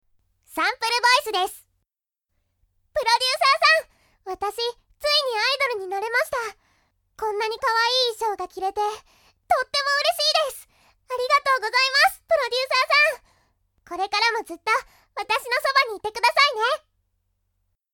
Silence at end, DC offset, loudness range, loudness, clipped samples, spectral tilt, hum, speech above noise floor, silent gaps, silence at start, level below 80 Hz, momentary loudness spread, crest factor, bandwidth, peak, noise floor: 1.15 s; under 0.1%; 4 LU; -21 LUFS; under 0.1%; 0.5 dB/octave; none; 61 dB; none; 0.5 s; -62 dBFS; 12 LU; 20 dB; 19 kHz; -4 dBFS; -83 dBFS